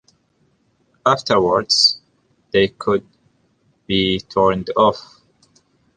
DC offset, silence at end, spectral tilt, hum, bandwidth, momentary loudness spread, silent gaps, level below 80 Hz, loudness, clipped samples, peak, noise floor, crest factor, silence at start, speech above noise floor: under 0.1%; 0.95 s; -4 dB/octave; none; 9.8 kHz; 9 LU; none; -50 dBFS; -17 LUFS; under 0.1%; -2 dBFS; -62 dBFS; 18 dB; 1.05 s; 46 dB